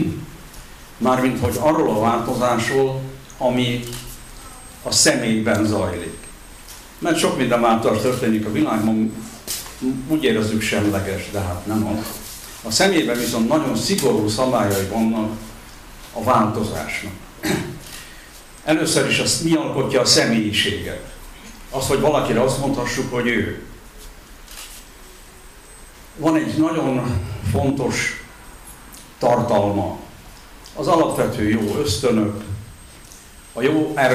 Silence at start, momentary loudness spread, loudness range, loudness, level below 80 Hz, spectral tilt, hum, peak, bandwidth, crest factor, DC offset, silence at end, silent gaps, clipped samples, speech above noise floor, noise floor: 0 s; 22 LU; 5 LU; -19 LUFS; -42 dBFS; -4.5 dB/octave; none; 0 dBFS; 16 kHz; 20 dB; under 0.1%; 0 s; none; under 0.1%; 23 dB; -42 dBFS